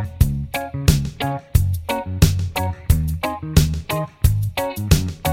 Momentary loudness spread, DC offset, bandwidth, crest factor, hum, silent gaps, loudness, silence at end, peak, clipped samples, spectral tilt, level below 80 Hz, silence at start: 7 LU; under 0.1%; 16.5 kHz; 18 dB; none; none; -21 LUFS; 0 s; -2 dBFS; under 0.1%; -5.5 dB/octave; -24 dBFS; 0 s